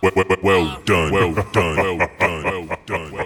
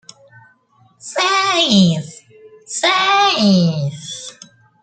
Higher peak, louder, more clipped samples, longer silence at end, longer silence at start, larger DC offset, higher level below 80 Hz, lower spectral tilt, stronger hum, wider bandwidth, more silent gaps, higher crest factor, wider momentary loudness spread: about the same, -4 dBFS vs -2 dBFS; second, -19 LUFS vs -14 LUFS; neither; second, 0 s vs 0.5 s; second, 0 s vs 1.05 s; neither; first, -38 dBFS vs -58 dBFS; first, -5.5 dB/octave vs -4 dB/octave; neither; first, 20 kHz vs 9.2 kHz; neither; about the same, 14 dB vs 16 dB; second, 9 LU vs 17 LU